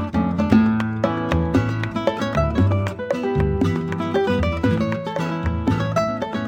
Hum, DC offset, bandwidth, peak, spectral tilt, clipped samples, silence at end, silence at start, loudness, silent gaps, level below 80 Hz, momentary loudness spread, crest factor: none; under 0.1%; 9.8 kHz; -2 dBFS; -7.5 dB/octave; under 0.1%; 0 s; 0 s; -21 LUFS; none; -34 dBFS; 6 LU; 20 dB